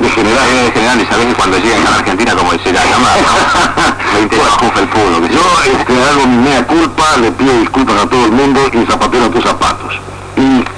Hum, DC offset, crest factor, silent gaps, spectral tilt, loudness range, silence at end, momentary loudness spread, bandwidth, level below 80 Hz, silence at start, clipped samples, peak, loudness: none; under 0.1%; 10 dB; none; -4 dB/octave; 1 LU; 0 s; 3 LU; 10.5 kHz; -30 dBFS; 0 s; under 0.1%; 0 dBFS; -9 LUFS